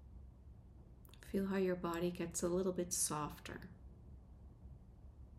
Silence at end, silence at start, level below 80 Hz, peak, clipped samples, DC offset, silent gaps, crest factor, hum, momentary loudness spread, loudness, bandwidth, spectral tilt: 0 s; 0 s; -60 dBFS; -24 dBFS; under 0.1%; under 0.1%; none; 18 dB; none; 23 LU; -40 LUFS; 15.5 kHz; -4.5 dB/octave